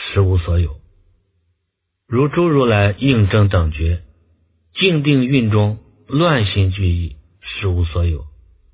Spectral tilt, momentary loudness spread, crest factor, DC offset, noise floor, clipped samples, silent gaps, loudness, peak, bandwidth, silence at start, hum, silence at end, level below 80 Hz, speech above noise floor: -11.5 dB/octave; 11 LU; 16 dB; under 0.1%; -74 dBFS; under 0.1%; none; -17 LUFS; 0 dBFS; 4 kHz; 0 s; none; 0.45 s; -26 dBFS; 59 dB